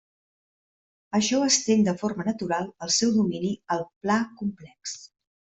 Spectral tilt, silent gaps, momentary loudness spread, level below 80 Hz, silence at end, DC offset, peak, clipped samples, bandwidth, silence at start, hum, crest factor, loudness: -3.5 dB/octave; 3.96-4.01 s; 15 LU; -64 dBFS; 0.35 s; under 0.1%; -8 dBFS; under 0.1%; 8.2 kHz; 1.15 s; none; 18 dB; -25 LUFS